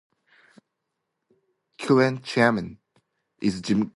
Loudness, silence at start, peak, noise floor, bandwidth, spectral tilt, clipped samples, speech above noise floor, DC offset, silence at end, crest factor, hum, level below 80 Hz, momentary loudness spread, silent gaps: -23 LUFS; 1.8 s; -6 dBFS; -81 dBFS; 11.5 kHz; -6 dB/octave; under 0.1%; 58 dB; under 0.1%; 0.05 s; 22 dB; none; -60 dBFS; 12 LU; none